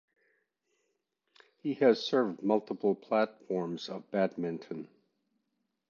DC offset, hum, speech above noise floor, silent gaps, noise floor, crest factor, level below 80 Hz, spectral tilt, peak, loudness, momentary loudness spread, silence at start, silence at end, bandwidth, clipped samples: under 0.1%; none; 51 dB; none; -82 dBFS; 22 dB; -84 dBFS; -6.5 dB/octave; -12 dBFS; -31 LUFS; 14 LU; 1.65 s; 1.05 s; 7.2 kHz; under 0.1%